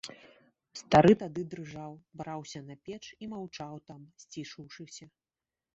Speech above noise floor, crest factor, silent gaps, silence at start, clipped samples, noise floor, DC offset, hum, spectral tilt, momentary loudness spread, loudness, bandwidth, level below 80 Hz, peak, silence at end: over 59 dB; 24 dB; none; 0.05 s; under 0.1%; under -90 dBFS; under 0.1%; none; -5.5 dB/octave; 25 LU; -28 LUFS; 8 kHz; -62 dBFS; -8 dBFS; 0.7 s